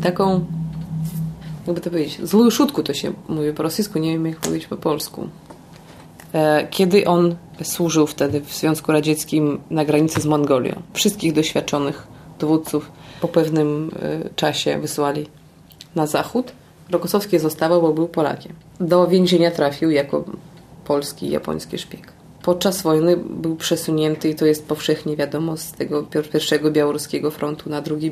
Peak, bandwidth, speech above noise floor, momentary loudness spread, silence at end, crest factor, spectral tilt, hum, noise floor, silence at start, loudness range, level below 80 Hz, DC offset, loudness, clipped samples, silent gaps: -2 dBFS; 15.5 kHz; 25 dB; 11 LU; 0 s; 18 dB; -5.5 dB/octave; none; -45 dBFS; 0 s; 4 LU; -54 dBFS; under 0.1%; -20 LUFS; under 0.1%; none